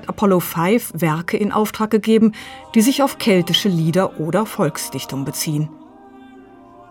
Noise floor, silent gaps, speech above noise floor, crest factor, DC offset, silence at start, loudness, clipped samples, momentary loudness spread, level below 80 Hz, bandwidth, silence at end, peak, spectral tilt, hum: -43 dBFS; none; 25 dB; 16 dB; under 0.1%; 0 s; -18 LUFS; under 0.1%; 9 LU; -56 dBFS; 19 kHz; 0.1 s; -2 dBFS; -5 dB/octave; none